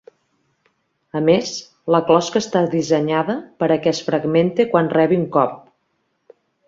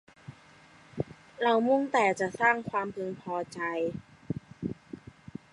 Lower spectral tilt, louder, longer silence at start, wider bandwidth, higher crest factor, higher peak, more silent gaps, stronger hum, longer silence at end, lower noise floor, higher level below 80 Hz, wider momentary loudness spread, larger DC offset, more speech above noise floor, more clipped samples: about the same, -6 dB/octave vs -5.5 dB/octave; first, -18 LUFS vs -30 LUFS; first, 1.15 s vs 0.3 s; second, 7.8 kHz vs 11.5 kHz; about the same, 18 dB vs 20 dB; first, -2 dBFS vs -12 dBFS; neither; neither; first, 1.1 s vs 0.55 s; first, -69 dBFS vs -56 dBFS; about the same, -60 dBFS vs -64 dBFS; second, 6 LU vs 22 LU; neither; first, 51 dB vs 28 dB; neither